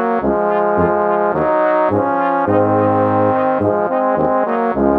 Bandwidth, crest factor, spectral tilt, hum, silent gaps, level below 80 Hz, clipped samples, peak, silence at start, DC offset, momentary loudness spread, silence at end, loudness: 4.8 kHz; 14 dB; -10 dB/octave; none; none; -44 dBFS; under 0.1%; 0 dBFS; 0 s; under 0.1%; 2 LU; 0 s; -15 LUFS